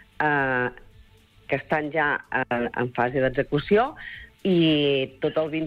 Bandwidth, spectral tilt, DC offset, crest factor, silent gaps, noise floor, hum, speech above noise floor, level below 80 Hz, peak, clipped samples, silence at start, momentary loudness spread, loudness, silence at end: 5.6 kHz; -8 dB/octave; under 0.1%; 14 dB; none; -54 dBFS; none; 30 dB; -52 dBFS; -10 dBFS; under 0.1%; 0.2 s; 9 LU; -24 LUFS; 0 s